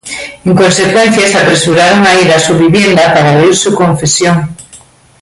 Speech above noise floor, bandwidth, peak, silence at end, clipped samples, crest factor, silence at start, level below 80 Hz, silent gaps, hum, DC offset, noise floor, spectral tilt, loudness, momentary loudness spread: 31 dB; 11.5 kHz; 0 dBFS; 0.45 s; under 0.1%; 8 dB; 0.05 s; -42 dBFS; none; none; under 0.1%; -38 dBFS; -4 dB/octave; -7 LUFS; 6 LU